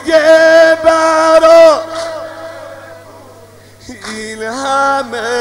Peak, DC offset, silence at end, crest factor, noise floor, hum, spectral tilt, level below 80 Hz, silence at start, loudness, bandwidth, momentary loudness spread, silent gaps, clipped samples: 0 dBFS; under 0.1%; 0 s; 10 dB; -38 dBFS; 50 Hz at -45 dBFS; -3 dB/octave; -48 dBFS; 0 s; -8 LUFS; 12 kHz; 22 LU; none; under 0.1%